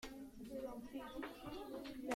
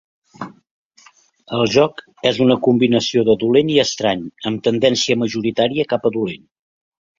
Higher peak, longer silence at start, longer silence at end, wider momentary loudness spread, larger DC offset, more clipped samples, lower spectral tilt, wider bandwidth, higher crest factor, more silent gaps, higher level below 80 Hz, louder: second, -26 dBFS vs 0 dBFS; second, 0 s vs 0.4 s; second, 0 s vs 0.85 s; second, 3 LU vs 12 LU; neither; neither; about the same, -4.5 dB/octave vs -5 dB/octave; first, 16.5 kHz vs 7.6 kHz; about the same, 22 dB vs 18 dB; second, none vs 0.71-0.90 s; second, -66 dBFS vs -56 dBFS; second, -50 LUFS vs -17 LUFS